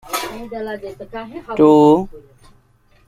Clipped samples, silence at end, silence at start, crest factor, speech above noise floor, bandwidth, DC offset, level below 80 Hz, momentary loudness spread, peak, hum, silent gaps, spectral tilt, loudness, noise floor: under 0.1%; 0.9 s; 0.05 s; 16 dB; 38 dB; 15.5 kHz; under 0.1%; -48 dBFS; 20 LU; -2 dBFS; none; none; -6 dB/octave; -15 LUFS; -54 dBFS